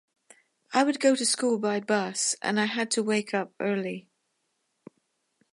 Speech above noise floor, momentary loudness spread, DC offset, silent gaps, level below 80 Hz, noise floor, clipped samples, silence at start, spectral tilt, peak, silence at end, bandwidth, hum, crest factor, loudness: 50 dB; 7 LU; under 0.1%; none; -82 dBFS; -77 dBFS; under 0.1%; 0.7 s; -3 dB/octave; -8 dBFS; 1.55 s; 11.5 kHz; none; 20 dB; -26 LUFS